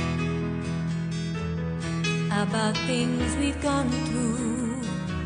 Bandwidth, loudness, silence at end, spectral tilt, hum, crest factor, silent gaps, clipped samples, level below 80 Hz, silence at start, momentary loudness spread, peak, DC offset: 10 kHz; -27 LUFS; 0 s; -5.5 dB/octave; none; 14 dB; none; under 0.1%; -42 dBFS; 0 s; 5 LU; -12 dBFS; under 0.1%